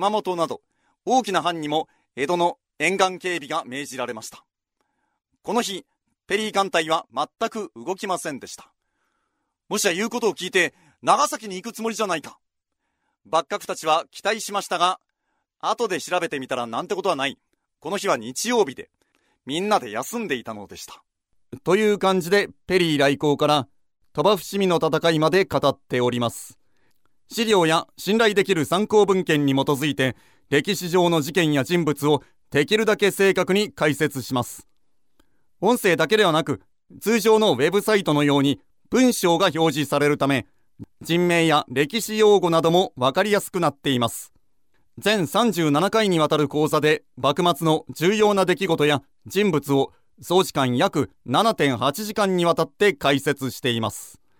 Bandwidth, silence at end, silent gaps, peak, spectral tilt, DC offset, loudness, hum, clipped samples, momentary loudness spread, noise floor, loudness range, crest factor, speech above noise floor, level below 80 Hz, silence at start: 18.5 kHz; 0.3 s; none; -2 dBFS; -4.5 dB/octave; under 0.1%; -22 LUFS; none; under 0.1%; 11 LU; -78 dBFS; 6 LU; 20 dB; 56 dB; -62 dBFS; 0 s